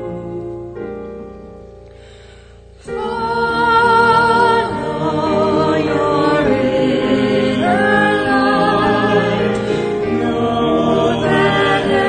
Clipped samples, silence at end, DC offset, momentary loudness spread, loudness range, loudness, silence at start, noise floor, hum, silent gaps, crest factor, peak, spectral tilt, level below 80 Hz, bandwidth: under 0.1%; 0 s; under 0.1%; 16 LU; 6 LU; -14 LUFS; 0 s; -40 dBFS; none; none; 14 dB; -2 dBFS; -6 dB/octave; -42 dBFS; 9.4 kHz